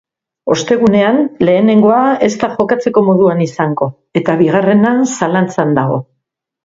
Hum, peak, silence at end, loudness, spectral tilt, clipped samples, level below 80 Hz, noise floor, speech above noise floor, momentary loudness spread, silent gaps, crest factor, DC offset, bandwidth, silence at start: none; 0 dBFS; 0.6 s; -12 LUFS; -6.5 dB/octave; under 0.1%; -52 dBFS; -71 dBFS; 60 dB; 8 LU; none; 12 dB; under 0.1%; 7.8 kHz; 0.45 s